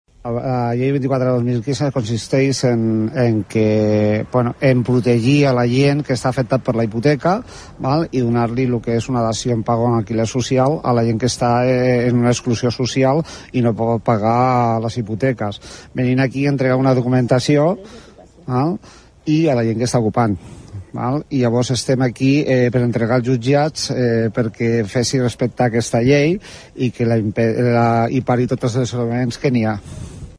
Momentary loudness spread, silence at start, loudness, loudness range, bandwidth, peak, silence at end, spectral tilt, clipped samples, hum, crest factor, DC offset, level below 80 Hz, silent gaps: 7 LU; 0.25 s; -17 LUFS; 2 LU; 11 kHz; -2 dBFS; 0 s; -6.5 dB/octave; under 0.1%; none; 14 dB; under 0.1%; -46 dBFS; none